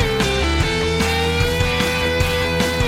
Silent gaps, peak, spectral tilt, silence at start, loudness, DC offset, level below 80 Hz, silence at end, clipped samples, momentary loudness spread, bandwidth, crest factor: none; -4 dBFS; -4.5 dB/octave; 0 s; -18 LUFS; under 0.1%; -26 dBFS; 0 s; under 0.1%; 1 LU; 16.5 kHz; 14 dB